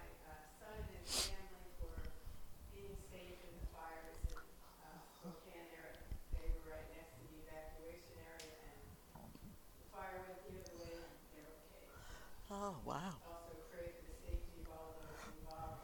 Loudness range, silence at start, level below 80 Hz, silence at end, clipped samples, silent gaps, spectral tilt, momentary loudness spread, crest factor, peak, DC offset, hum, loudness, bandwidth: 7 LU; 0 s; -54 dBFS; 0 s; under 0.1%; none; -3.5 dB/octave; 13 LU; 24 dB; -26 dBFS; under 0.1%; none; -52 LUFS; 19 kHz